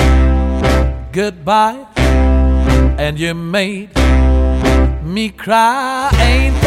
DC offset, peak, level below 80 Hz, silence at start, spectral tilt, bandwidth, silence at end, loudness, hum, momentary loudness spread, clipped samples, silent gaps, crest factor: under 0.1%; 0 dBFS; -14 dBFS; 0 s; -6 dB/octave; 12.5 kHz; 0 s; -14 LUFS; none; 7 LU; under 0.1%; none; 12 dB